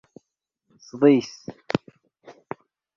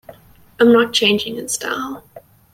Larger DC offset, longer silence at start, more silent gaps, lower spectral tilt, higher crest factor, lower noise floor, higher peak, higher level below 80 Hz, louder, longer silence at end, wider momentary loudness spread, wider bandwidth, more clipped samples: neither; first, 0.95 s vs 0.1 s; neither; first, -6.5 dB/octave vs -3 dB/octave; first, 24 dB vs 16 dB; first, -80 dBFS vs -45 dBFS; about the same, -2 dBFS vs -2 dBFS; second, -66 dBFS vs -58 dBFS; second, -22 LUFS vs -16 LUFS; first, 1.2 s vs 0.35 s; first, 22 LU vs 14 LU; second, 7.2 kHz vs 16.5 kHz; neither